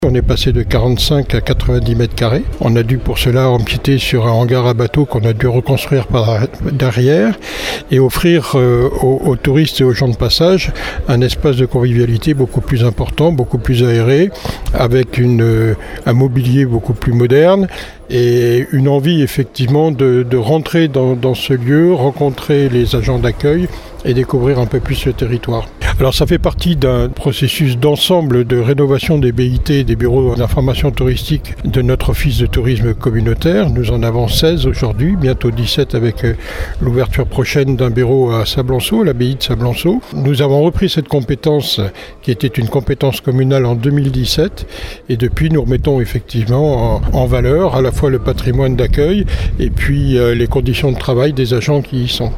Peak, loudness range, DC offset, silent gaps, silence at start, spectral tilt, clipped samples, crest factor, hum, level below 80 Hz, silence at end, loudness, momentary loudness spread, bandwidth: 0 dBFS; 2 LU; under 0.1%; none; 0 s; -6.5 dB/octave; under 0.1%; 12 dB; none; -22 dBFS; 0 s; -13 LUFS; 5 LU; 16 kHz